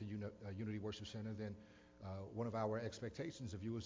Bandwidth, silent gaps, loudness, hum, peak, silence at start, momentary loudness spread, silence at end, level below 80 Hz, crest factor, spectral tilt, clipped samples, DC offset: 7.6 kHz; none; -47 LUFS; none; -28 dBFS; 0 s; 9 LU; 0 s; -66 dBFS; 18 dB; -6.5 dB/octave; under 0.1%; under 0.1%